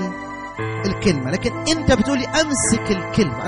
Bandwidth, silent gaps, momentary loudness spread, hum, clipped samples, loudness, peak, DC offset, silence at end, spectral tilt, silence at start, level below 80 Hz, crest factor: 10.5 kHz; none; 10 LU; none; under 0.1%; -20 LUFS; -6 dBFS; under 0.1%; 0 s; -4.5 dB/octave; 0 s; -36 dBFS; 14 dB